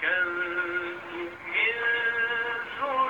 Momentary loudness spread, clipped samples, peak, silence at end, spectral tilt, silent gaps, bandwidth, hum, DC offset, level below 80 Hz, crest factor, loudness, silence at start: 11 LU; under 0.1%; -14 dBFS; 0 s; -4 dB/octave; none; 17 kHz; none; under 0.1%; -66 dBFS; 14 dB; -27 LUFS; 0 s